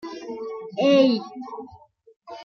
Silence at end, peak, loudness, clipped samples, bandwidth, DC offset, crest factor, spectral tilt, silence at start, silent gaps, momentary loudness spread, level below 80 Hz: 0 s; -6 dBFS; -22 LUFS; under 0.1%; 6.8 kHz; under 0.1%; 18 dB; -6 dB/octave; 0.05 s; 2.16-2.20 s; 21 LU; -70 dBFS